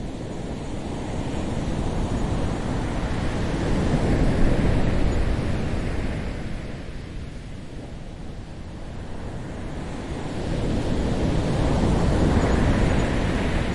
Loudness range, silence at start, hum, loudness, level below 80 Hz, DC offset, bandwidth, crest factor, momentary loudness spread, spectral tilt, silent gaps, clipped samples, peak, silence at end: 12 LU; 0 s; none; -25 LUFS; -28 dBFS; under 0.1%; 11.5 kHz; 16 dB; 16 LU; -7 dB/octave; none; under 0.1%; -6 dBFS; 0 s